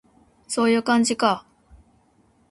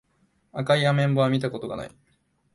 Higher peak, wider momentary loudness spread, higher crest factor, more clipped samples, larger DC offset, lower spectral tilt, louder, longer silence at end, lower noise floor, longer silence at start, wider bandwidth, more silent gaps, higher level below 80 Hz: first, -4 dBFS vs -8 dBFS; second, 10 LU vs 16 LU; about the same, 20 dB vs 18 dB; neither; neither; second, -3.5 dB/octave vs -7 dB/octave; first, -21 LUFS vs -24 LUFS; first, 1.1 s vs 0.65 s; second, -61 dBFS vs -67 dBFS; about the same, 0.5 s vs 0.55 s; about the same, 11.5 kHz vs 11.5 kHz; neither; about the same, -60 dBFS vs -60 dBFS